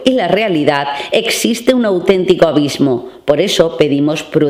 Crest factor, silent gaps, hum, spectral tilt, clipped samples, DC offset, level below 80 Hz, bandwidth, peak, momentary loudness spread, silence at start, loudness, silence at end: 12 dB; none; none; -4.5 dB/octave; 0.3%; under 0.1%; -46 dBFS; 16.5 kHz; 0 dBFS; 5 LU; 0 s; -13 LUFS; 0 s